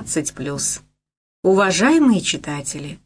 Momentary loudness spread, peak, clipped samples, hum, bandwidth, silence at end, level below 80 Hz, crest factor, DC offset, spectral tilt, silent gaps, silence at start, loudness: 12 LU; -4 dBFS; under 0.1%; none; 11 kHz; 0.1 s; -52 dBFS; 14 dB; under 0.1%; -4 dB/octave; 1.17-1.43 s; 0 s; -18 LUFS